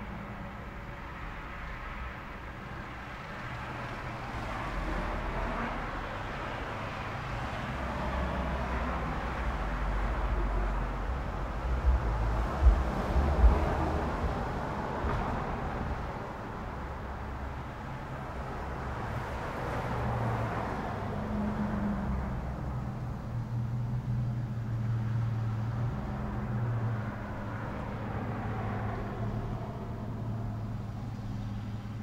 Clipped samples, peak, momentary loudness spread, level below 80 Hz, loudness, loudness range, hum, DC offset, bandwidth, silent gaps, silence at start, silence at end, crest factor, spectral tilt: under 0.1%; -10 dBFS; 9 LU; -36 dBFS; -35 LUFS; 8 LU; none; under 0.1%; 9.6 kHz; none; 0 s; 0 s; 22 dB; -7.5 dB/octave